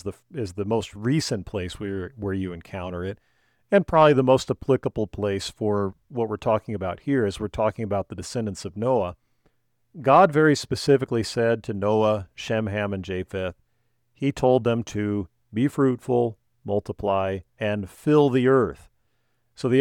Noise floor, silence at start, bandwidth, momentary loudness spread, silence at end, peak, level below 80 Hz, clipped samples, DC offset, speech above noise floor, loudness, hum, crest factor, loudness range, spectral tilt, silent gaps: -72 dBFS; 0.05 s; 15.5 kHz; 13 LU; 0 s; -4 dBFS; -52 dBFS; under 0.1%; under 0.1%; 49 dB; -24 LUFS; none; 20 dB; 5 LU; -6.5 dB/octave; none